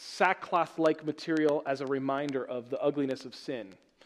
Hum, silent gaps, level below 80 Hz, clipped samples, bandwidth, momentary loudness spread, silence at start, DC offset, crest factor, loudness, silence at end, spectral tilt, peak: none; none; -80 dBFS; under 0.1%; 12 kHz; 11 LU; 0 s; under 0.1%; 22 dB; -31 LUFS; 0.3 s; -5.5 dB/octave; -10 dBFS